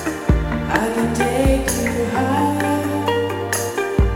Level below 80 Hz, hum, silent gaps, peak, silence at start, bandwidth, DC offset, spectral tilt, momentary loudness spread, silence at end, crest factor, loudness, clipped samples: -26 dBFS; none; none; -2 dBFS; 0 s; 17 kHz; under 0.1%; -5.5 dB/octave; 3 LU; 0 s; 18 dB; -19 LUFS; under 0.1%